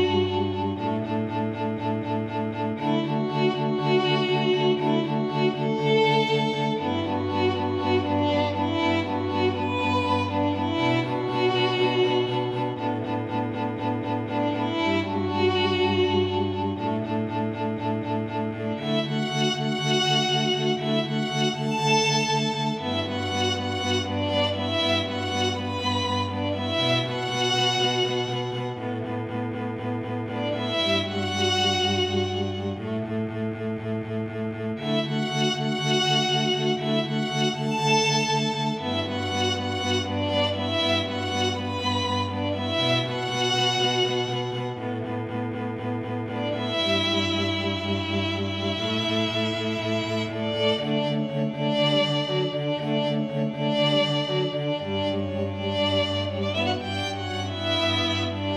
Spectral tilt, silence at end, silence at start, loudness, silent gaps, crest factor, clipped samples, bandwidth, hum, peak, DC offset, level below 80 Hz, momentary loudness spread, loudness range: -5 dB/octave; 0 s; 0 s; -25 LUFS; none; 16 dB; under 0.1%; 12 kHz; none; -10 dBFS; under 0.1%; -64 dBFS; 8 LU; 3 LU